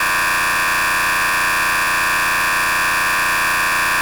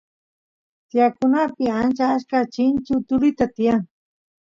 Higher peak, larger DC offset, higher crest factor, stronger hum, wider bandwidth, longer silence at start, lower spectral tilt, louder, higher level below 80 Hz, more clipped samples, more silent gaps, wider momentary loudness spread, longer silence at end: second, -10 dBFS vs -6 dBFS; first, 0.1% vs under 0.1%; second, 6 dB vs 14 dB; neither; first, over 20 kHz vs 7.4 kHz; second, 0 s vs 0.95 s; second, -0.5 dB/octave vs -7 dB/octave; first, -15 LUFS vs -20 LUFS; first, -42 dBFS vs -54 dBFS; neither; neither; second, 0 LU vs 4 LU; second, 0 s vs 0.65 s